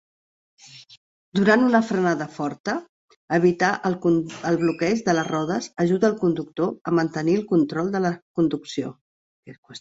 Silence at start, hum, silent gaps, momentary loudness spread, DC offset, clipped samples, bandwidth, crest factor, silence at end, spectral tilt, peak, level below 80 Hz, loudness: 0.75 s; none; 0.97-1.32 s, 2.60-2.64 s, 2.89-3.08 s, 3.16-3.28 s, 6.81-6.85 s, 8.22-8.34 s, 9.01-9.43 s, 9.58-9.63 s; 10 LU; under 0.1%; under 0.1%; 8 kHz; 20 dB; 0 s; -6.5 dB/octave; -4 dBFS; -62 dBFS; -22 LUFS